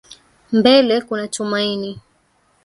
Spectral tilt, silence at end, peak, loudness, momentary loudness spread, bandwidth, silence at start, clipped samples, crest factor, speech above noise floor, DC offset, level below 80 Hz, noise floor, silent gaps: -4 dB/octave; 0.65 s; 0 dBFS; -17 LUFS; 13 LU; 11.5 kHz; 0.5 s; under 0.1%; 18 dB; 44 dB; under 0.1%; -60 dBFS; -60 dBFS; none